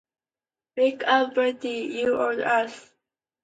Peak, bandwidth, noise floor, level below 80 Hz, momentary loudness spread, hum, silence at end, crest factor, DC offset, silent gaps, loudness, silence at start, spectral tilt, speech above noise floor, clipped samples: -8 dBFS; 9 kHz; under -90 dBFS; -72 dBFS; 9 LU; none; 0.65 s; 18 dB; under 0.1%; none; -24 LUFS; 0.75 s; -3.5 dB/octave; over 66 dB; under 0.1%